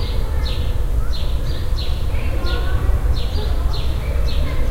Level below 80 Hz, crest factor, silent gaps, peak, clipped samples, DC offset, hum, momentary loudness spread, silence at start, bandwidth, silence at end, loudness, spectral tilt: -18 dBFS; 12 dB; none; -4 dBFS; under 0.1%; under 0.1%; none; 3 LU; 0 s; 15.5 kHz; 0 s; -23 LUFS; -6 dB/octave